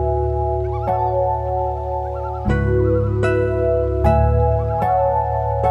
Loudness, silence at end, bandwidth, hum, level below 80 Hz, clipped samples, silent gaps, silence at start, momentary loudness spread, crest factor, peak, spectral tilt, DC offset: -19 LUFS; 0 s; 8 kHz; none; -26 dBFS; under 0.1%; none; 0 s; 6 LU; 14 dB; -4 dBFS; -9.5 dB/octave; under 0.1%